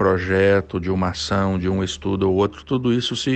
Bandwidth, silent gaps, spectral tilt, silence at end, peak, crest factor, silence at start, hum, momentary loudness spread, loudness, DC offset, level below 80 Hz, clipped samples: 8.8 kHz; none; -6 dB/octave; 0 s; -6 dBFS; 14 dB; 0 s; none; 6 LU; -20 LUFS; under 0.1%; -44 dBFS; under 0.1%